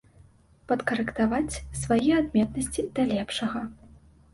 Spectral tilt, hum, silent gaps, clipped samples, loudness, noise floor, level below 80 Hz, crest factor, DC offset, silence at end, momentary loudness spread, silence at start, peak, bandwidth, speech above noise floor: -5 dB/octave; none; none; under 0.1%; -27 LUFS; -56 dBFS; -48 dBFS; 16 dB; under 0.1%; 0.45 s; 9 LU; 0.7 s; -10 dBFS; 11.5 kHz; 30 dB